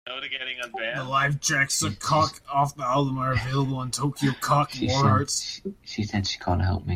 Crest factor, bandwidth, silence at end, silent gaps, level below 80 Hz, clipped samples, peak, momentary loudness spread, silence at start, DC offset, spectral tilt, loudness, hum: 18 dB; 16 kHz; 0 s; none; -50 dBFS; under 0.1%; -8 dBFS; 8 LU; 0.05 s; under 0.1%; -4 dB/octave; -25 LUFS; none